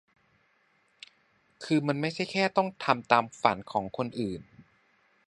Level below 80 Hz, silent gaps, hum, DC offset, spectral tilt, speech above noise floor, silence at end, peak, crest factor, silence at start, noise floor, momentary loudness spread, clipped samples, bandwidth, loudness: -66 dBFS; none; none; under 0.1%; -5.5 dB/octave; 41 dB; 0.65 s; -4 dBFS; 26 dB; 1.6 s; -69 dBFS; 11 LU; under 0.1%; 11.5 kHz; -28 LUFS